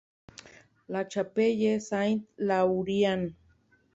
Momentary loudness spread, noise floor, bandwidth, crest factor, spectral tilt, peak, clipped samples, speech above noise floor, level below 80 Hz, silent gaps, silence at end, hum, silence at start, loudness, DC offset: 11 LU; -65 dBFS; 8 kHz; 16 dB; -6 dB/octave; -14 dBFS; under 0.1%; 38 dB; -66 dBFS; none; 0.65 s; none; 0.9 s; -28 LUFS; under 0.1%